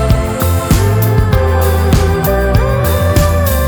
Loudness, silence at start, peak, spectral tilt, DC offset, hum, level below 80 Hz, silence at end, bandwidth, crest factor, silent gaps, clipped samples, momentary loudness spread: -12 LUFS; 0 s; 0 dBFS; -6 dB/octave; under 0.1%; none; -18 dBFS; 0 s; over 20 kHz; 10 dB; none; under 0.1%; 2 LU